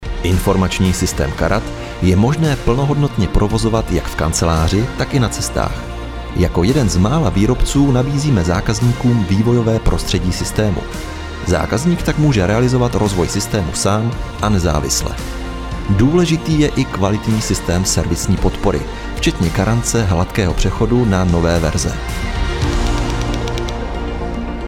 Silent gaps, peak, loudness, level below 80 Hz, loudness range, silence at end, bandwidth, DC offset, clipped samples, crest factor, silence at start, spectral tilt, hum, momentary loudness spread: none; 0 dBFS; -16 LUFS; -24 dBFS; 2 LU; 0 s; 16.5 kHz; under 0.1%; under 0.1%; 14 dB; 0 s; -5.5 dB/octave; none; 8 LU